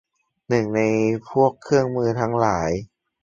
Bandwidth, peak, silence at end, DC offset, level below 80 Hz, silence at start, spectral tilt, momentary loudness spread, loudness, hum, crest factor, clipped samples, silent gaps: 7.6 kHz; -4 dBFS; 0.4 s; under 0.1%; -50 dBFS; 0.5 s; -7 dB/octave; 4 LU; -21 LUFS; none; 18 dB; under 0.1%; none